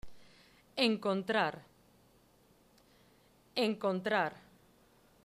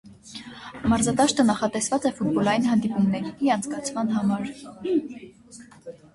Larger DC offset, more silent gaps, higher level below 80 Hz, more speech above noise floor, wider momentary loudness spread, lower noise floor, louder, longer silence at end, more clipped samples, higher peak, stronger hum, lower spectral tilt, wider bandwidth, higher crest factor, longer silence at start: neither; neither; second, -70 dBFS vs -52 dBFS; first, 34 dB vs 24 dB; second, 9 LU vs 19 LU; first, -66 dBFS vs -47 dBFS; second, -34 LUFS vs -24 LUFS; first, 0.85 s vs 0.2 s; neither; second, -16 dBFS vs -8 dBFS; neither; about the same, -5 dB/octave vs -5 dB/octave; first, 15 kHz vs 11.5 kHz; first, 22 dB vs 16 dB; about the same, 0.05 s vs 0.05 s